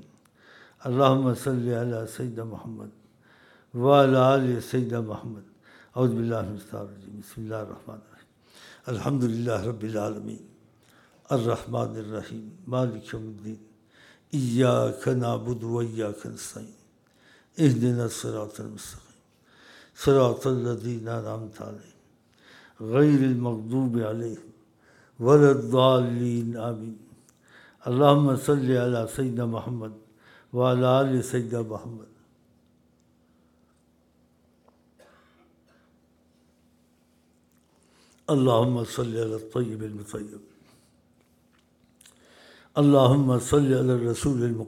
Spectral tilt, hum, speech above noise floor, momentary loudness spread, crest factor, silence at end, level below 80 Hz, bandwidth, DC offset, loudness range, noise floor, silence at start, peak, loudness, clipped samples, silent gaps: -7 dB/octave; none; 40 dB; 21 LU; 24 dB; 0 s; -58 dBFS; 15.5 kHz; under 0.1%; 9 LU; -64 dBFS; 0.8 s; -2 dBFS; -25 LUFS; under 0.1%; none